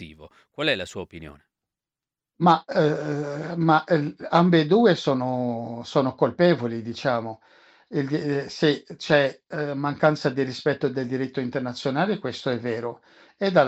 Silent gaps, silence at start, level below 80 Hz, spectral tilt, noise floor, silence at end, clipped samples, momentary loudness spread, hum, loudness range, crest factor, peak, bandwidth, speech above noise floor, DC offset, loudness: none; 0 s; -64 dBFS; -6.5 dB/octave; under -90 dBFS; 0 s; under 0.1%; 12 LU; none; 4 LU; 18 dB; -6 dBFS; 8.6 kHz; over 67 dB; under 0.1%; -24 LUFS